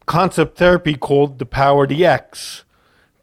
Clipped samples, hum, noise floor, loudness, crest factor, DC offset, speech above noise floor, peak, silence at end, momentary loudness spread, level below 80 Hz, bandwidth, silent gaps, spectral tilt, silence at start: under 0.1%; none; -57 dBFS; -15 LUFS; 14 dB; under 0.1%; 42 dB; -2 dBFS; 0.65 s; 16 LU; -40 dBFS; 15.5 kHz; none; -6 dB/octave; 0.1 s